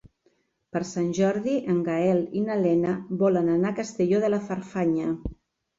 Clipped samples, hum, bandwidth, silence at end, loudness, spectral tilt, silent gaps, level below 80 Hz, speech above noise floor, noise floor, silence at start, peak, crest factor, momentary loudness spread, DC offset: under 0.1%; none; 7.8 kHz; 0.45 s; -25 LUFS; -7.5 dB/octave; none; -52 dBFS; 44 dB; -68 dBFS; 0.05 s; -12 dBFS; 14 dB; 8 LU; under 0.1%